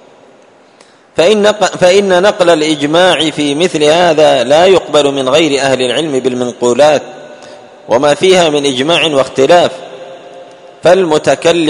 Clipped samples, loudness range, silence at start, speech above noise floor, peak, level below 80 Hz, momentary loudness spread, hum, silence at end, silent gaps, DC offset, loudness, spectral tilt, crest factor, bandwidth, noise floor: 0.6%; 3 LU; 1.15 s; 34 dB; 0 dBFS; -50 dBFS; 7 LU; none; 0 s; none; under 0.1%; -9 LUFS; -4 dB/octave; 10 dB; 11 kHz; -43 dBFS